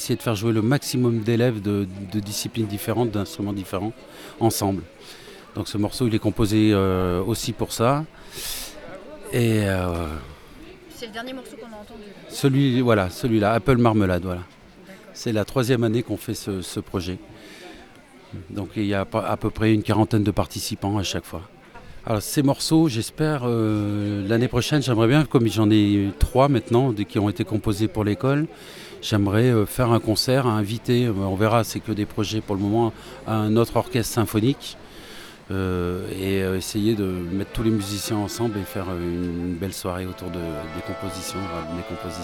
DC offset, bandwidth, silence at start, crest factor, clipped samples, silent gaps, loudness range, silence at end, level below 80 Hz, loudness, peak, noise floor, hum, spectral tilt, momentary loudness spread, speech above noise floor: under 0.1%; 18 kHz; 0 s; 20 dB; under 0.1%; none; 7 LU; 0 s; -42 dBFS; -23 LUFS; -4 dBFS; -47 dBFS; none; -6 dB/octave; 17 LU; 25 dB